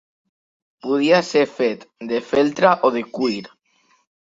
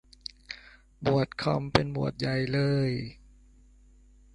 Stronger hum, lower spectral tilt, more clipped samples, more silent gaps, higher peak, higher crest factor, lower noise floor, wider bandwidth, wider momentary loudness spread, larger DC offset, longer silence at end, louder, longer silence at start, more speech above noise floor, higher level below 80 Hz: neither; second, -5 dB/octave vs -7 dB/octave; neither; neither; about the same, -2 dBFS vs -4 dBFS; second, 20 dB vs 28 dB; first, -62 dBFS vs -57 dBFS; second, 7.8 kHz vs 10.5 kHz; second, 11 LU vs 17 LU; neither; second, 0.75 s vs 1.2 s; first, -19 LUFS vs -28 LUFS; first, 0.85 s vs 0.5 s; first, 43 dB vs 29 dB; second, -64 dBFS vs -52 dBFS